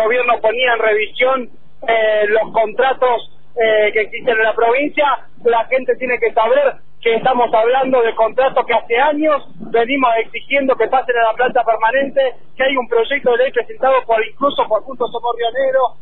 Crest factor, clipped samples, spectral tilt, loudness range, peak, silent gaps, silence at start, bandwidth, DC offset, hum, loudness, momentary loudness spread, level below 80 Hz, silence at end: 12 dB; under 0.1%; -7.5 dB/octave; 1 LU; -2 dBFS; none; 0 s; 4.1 kHz; 4%; none; -15 LUFS; 5 LU; -50 dBFS; 0.1 s